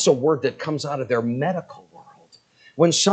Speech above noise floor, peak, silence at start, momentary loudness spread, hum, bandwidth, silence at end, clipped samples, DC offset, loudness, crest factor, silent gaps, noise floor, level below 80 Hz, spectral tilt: 34 dB; -4 dBFS; 0 s; 12 LU; none; 9.2 kHz; 0 s; under 0.1%; under 0.1%; -22 LUFS; 20 dB; none; -54 dBFS; -70 dBFS; -4 dB/octave